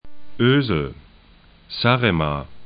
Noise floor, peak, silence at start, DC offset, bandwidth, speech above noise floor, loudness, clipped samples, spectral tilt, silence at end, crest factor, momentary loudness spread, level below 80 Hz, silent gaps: -50 dBFS; -2 dBFS; 0.05 s; under 0.1%; 5.2 kHz; 31 dB; -20 LUFS; under 0.1%; -11.5 dB/octave; 0 s; 20 dB; 11 LU; -42 dBFS; none